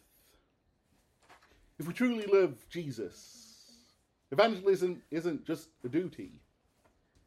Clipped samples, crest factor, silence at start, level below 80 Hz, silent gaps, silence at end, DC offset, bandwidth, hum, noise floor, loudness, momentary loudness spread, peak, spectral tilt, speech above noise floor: under 0.1%; 24 dB; 1.8 s; -72 dBFS; none; 0.95 s; under 0.1%; 14.5 kHz; none; -74 dBFS; -32 LUFS; 21 LU; -10 dBFS; -6 dB/octave; 42 dB